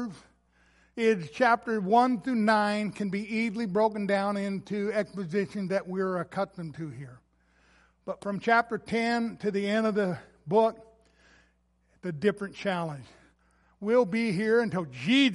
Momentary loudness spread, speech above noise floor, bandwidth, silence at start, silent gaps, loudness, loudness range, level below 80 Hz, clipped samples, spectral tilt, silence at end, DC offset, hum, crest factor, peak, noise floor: 14 LU; 41 dB; 11.5 kHz; 0 s; none; -28 LUFS; 6 LU; -66 dBFS; under 0.1%; -6 dB/octave; 0 s; under 0.1%; none; 20 dB; -8 dBFS; -68 dBFS